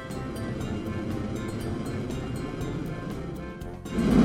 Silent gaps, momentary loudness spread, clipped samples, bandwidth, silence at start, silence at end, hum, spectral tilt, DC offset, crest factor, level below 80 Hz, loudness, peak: none; 4 LU; under 0.1%; 16.5 kHz; 0 s; 0 s; none; -7 dB/octave; under 0.1%; 20 dB; -42 dBFS; -32 LUFS; -8 dBFS